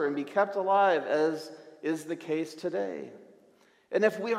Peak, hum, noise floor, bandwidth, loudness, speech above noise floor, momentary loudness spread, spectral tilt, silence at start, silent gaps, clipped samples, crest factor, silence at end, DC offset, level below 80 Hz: -10 dBFS; none; -62 dBFS; 14.5 kHz; -29 LUFS; 34 dB; 14 LU; -5.5 dB/octave; 0 s; none; under 0.1%; 20 dB; 0 s; under 0.1%; -88 dBFS